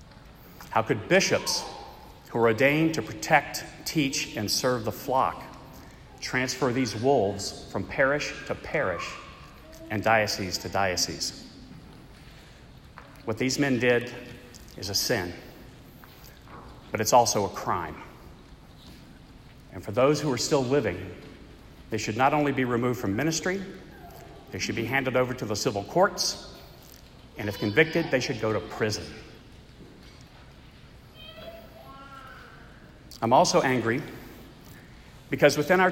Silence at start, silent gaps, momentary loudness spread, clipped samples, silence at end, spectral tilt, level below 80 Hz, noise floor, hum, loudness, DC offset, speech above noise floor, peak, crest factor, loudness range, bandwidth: 0 s; none; 24 LU; under 0.1%; 0 s; -4 dB/octave; -54 dBFS; -50 dBFS; none; -26 LUFS; under 0.1%; 24 dB; -4 dBFS; 24 dB; 6 LU; 16 kHz